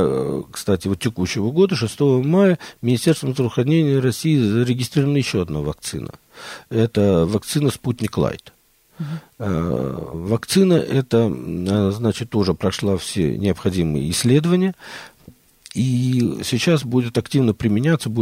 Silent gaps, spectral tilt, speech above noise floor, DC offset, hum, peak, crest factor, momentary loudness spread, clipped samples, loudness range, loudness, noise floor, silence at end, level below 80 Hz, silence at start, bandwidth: none; -6 dB/octave; 29 dB; under 0.1%; none; -4 dBFS; 16 dB; 11 LU; under 0.1%; 4 LU; -19 LUFS; -48 dBFS; 0 s; -46 dBFS; 0 s; 16 kHz